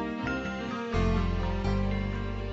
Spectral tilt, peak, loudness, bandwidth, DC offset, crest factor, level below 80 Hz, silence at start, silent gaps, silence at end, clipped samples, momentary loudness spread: -7.5 dB/octave; -16 dBFS; -31 LUFS; 7.8 kHz; under 0.1%; 14 dB; -34 dBFS; 0 s; none; 0 s; under 0.1%; 5 LU